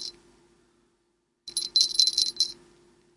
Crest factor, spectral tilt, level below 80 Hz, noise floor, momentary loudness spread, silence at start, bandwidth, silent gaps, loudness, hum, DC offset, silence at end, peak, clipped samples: 28 dB; 2 dB/octave; -70 dBFS; -73 dBFS; 17 LU; 0 s; 11.5 kHz; none; -23 LUFS; none; under 0.1%; 0.65 s; -2 dBFS; under 0.1%